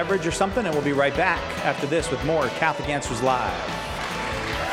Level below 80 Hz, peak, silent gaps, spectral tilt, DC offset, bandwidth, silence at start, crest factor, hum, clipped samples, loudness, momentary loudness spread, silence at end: -42 dBFS; -6 dBFS; none; -4.5 dB/octave; under 0.1%; 16 kHz; 0 s; 18 dB; none; under 0.1%; -24 LUFS; 6 LU; 0 s